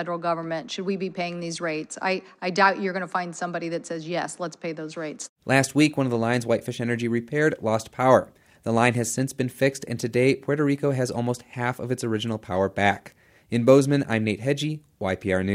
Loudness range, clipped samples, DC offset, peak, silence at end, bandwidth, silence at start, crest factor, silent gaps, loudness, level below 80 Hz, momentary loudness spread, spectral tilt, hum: 3 LU; under 0.1%; under 0.1%; -2 dBFS; 0 s; 16 kHz; 0 s; 22 dB; 5.29-5.36 s; -25 LUFS; -66 dBFS; 11 LU; -5.5 dB/octave; none